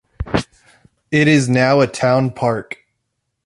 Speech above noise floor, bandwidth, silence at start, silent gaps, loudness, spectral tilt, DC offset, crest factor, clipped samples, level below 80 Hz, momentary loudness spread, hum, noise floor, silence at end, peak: 59 dB; 11.5 kHz; 0.2 s; none; -16 LUFS; -6 dB/octave; under 0.1%; 16 dB; under 0.1%; -40 dBFS; 17 LU; none; -73 dBFS; 0.7 s; -2 dBFS